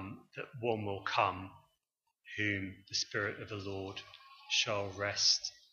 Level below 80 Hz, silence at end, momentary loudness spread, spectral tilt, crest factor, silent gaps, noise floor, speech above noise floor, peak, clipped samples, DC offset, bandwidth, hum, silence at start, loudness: -74 dBFS; 0.2 s; 18 LU; -2.5 dB/octave; 22 dB; none; -85 dBFS; 49 dB; -16 dBFS; under 0.1%; under 0.1%; 7.6 kHz; none; 0 s; -34 LUFS